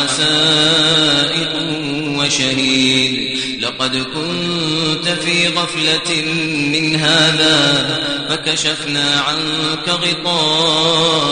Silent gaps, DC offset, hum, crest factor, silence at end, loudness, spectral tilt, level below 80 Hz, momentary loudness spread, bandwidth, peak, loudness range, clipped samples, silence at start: none; under 0.1%; none; 16 dB; 0 s; -14 LUFS; -3 dB/octave; -50 dBFS; 8 LU; 10 kHz; 0 dBFS; 3 LU; under 0.1%; 0 s